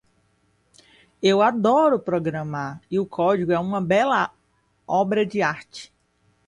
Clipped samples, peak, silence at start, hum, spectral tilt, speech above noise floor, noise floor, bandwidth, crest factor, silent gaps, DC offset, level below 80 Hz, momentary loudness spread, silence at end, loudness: under 0.1%; -6 dBFS; 1.2 s; none; -6 dB/octave; 44 dB; -65 dBFS; 11 kHz; 16 dB; none; under 0.1%; -62 dBFS; 11 LU; 0.6 s; -22 LUFS